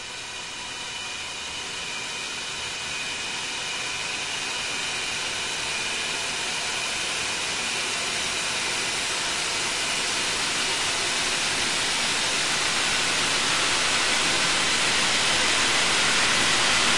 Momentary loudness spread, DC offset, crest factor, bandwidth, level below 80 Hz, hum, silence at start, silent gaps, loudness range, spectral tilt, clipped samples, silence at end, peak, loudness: 10 LU; under 0.1%; 16 dB; 12 kHz; -54 dBFS; none; 0 s; none; 8 LU; 0 dB/octave; under 0.1%; 0 s; -8 dBFS; -23 LUFS